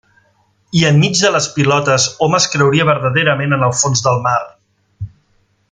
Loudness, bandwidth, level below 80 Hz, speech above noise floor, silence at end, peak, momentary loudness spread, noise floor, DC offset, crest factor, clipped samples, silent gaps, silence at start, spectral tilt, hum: -13 LUFS; 9.6 kHz; -50 dBFS; 45 dB; 0.65 s; 0 dBFS; 15 LU; -58 dBFS; under 0.1%; 14 dB; under 0.1%; none; 0.75 s; -4 dB/octave; none